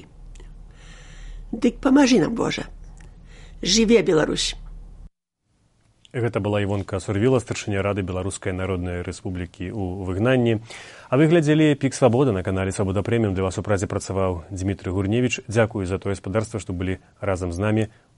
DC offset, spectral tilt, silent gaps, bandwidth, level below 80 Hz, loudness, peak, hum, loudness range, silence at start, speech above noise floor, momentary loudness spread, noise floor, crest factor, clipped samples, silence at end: under 0.1%; -5.5 dB/octave; none; 11.5 kHz; -44 dBFS; -22 LUFS; -4 dBFS; none; 5 LU; 0 s; 49 dB; 13 LU; -70 dBFS; 20 dB; under 0.1%; 0.3 s